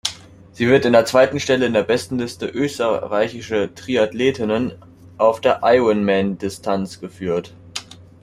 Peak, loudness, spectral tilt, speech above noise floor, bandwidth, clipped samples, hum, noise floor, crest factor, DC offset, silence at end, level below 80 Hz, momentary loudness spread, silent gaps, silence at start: -2 dBFS; -19 LUFS; -5 dB/octave; 20 dB; 15 kHz; under 0.1%; none; -38 dBFS; 18 dB; under 0.1%; 0.3 s; -54 dBFS; 11 LU; none; 0.05 s